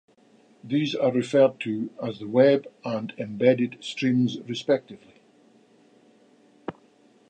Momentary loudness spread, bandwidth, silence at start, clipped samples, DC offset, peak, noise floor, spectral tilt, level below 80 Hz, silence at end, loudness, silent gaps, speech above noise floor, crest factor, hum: 13 LU; 9.2 kHz; 0.65 s; under 0.1%; under 0.1%; -6 dBFS; -59 dBFS; -6.5 dB/octave; -74 dBFS; 0.6 s; -24 LUFS; none; 35 dB; 20 dB; none